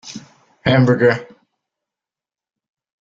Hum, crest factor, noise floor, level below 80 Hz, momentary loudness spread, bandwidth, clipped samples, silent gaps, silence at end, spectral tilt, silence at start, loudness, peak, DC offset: none; 18 dB; -89 dBFS; -52 dBFS; 22 LU; 7.6 kHz; under 0.1%; none; 1.75 s; -7 dB/octave; 0.05 s; -16 LUFS; -2 dBFS; under 0.1%